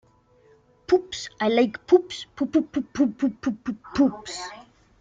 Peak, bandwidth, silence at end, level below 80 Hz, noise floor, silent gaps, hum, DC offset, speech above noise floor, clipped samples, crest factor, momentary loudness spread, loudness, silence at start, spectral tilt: -6 dBFS; 9.2 kHz; 0.4 s; -58 dBFS; -58 dBFS; none; none; under 0.1%; 34 dB; under 0.1%; 20 dB; 14 LU; -24 LUFS; 0.9 s; -5 dB/octave